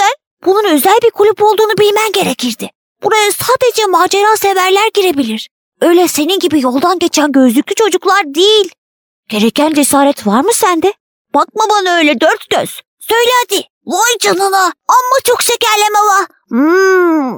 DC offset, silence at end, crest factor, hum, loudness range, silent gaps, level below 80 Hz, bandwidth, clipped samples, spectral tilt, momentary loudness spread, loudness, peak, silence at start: under 0.1%; 0 s; 10 dB; none; 1 LU; 0.27-0.37 s, 2.75-2.95 s, 5.51-5.72 s, 8.78-9.23 s, 11.00-11.25 s, 12.88-12.97 s, 13.70-13.81 s; -58 dBFS; over 20 kHz; under 0.1%; -2.5 dB/octave; 7 LU; -10 LUFS; 0 dBFS; 0 s